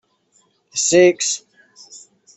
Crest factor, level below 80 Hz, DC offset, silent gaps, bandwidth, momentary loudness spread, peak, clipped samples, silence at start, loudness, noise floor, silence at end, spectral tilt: 18 dB; -64 dBFS; under 0.1%; none; 8.4 kHz; 14 LU; -2 dBFS; under 0.1%; 0.75 s; -16 LUFS; -61 dBFS; 0.4 s; -2.5 dB/octave